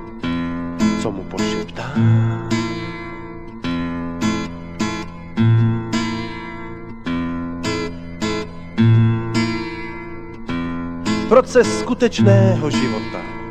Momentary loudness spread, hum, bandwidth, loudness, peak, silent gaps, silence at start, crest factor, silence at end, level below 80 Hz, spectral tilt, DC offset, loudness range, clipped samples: 15 LU; none; 9.2 kHz; -20 LUFS; 0 dBFS; none; 0 s; 20 dB; 0 s; -38 dBFS; -6.5 dB/octave; under 0.1%; 5 LU; under 0.1%